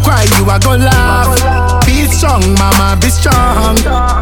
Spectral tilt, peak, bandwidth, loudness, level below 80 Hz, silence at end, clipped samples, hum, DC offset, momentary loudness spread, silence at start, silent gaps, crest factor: -4.5 dB/octave; 0 dBFS; 18.5 kHz; -9 LUFS; -14 dBFS; 0 s; 0.3%; none; under 0.1%; 2 LU; 0 s; none; 8 dB